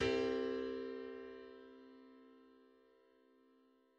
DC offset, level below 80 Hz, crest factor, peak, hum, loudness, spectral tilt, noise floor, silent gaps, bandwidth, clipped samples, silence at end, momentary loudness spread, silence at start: under 0.1%; -70 dBFS; 20 dB; -26 dBFS; none; -42 LUFS; -5.5 dB/octave; -72 dBFS; none; 8.4 kHz; under 0.1%; 1.5 s; 24 LU; 0 s